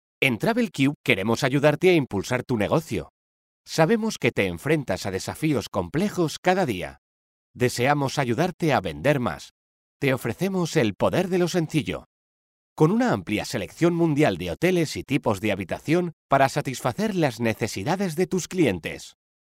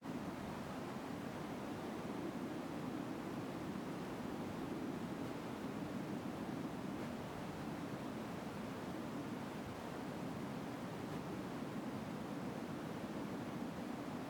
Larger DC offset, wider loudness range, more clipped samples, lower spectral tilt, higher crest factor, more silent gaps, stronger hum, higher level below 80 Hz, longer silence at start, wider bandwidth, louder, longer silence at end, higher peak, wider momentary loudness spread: neither; about the same, 2 LU vs 1 LU; neither; about the same, -5.5 dB/octave vs -6 dB/octave; first, 20 dB vs 12 dB; first, 0.96-1.04 s, 3.10-3.64 s, 6.38-6.43 s, 6.98-7.54 s, 8.54-8.59 s, 9.51-10.00 s, 12.06-12.76 s, 16.13-16.29 s vs none; neither; first, -54 dBFS vs -70 dBFS; first, 0.2 s vs 0 s; second, 16 kHz vs over 20 kHz; first, -24 LUFS vs -46 LUFS; first, 0.35 s vs 0 s; first, -4 dBFS vs -32 dBFS; first, 7 LU vs 2 LU